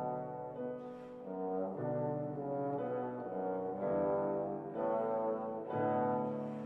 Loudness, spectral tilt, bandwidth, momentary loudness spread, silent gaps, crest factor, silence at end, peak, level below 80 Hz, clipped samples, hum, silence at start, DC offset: -38 LUFS; -10.5 dB/octave; 4.1 kHz; 9 LU; none; 14 dB; 0 s; -24 dBFS; -74 dBFS; under 0.1%; none; 0 s; under 0.1%